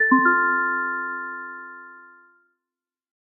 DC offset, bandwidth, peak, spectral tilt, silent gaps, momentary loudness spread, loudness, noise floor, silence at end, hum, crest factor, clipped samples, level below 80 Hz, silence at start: under 0.1%; 2.5 kHz; -4 dBFS; -5.5 dB/octave; none; 22 LU; -21 LUFS; -89 dBFS; 1.2 s; none; 20 dB; under 0.1%; under -90 dBFS; 0 s